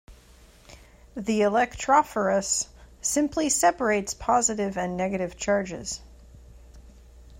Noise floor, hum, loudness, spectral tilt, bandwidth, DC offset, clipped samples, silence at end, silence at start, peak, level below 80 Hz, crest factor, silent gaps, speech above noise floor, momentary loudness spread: -53 dBFS; none; -25 LUFS; -3.5 dB/octave; 16 kHz; under 0.1%; under 0.1%; 0.05 s; 0.1 s; -8 dBFS; -50 dBFS; 20 dB; none; 28 dB; 12 LU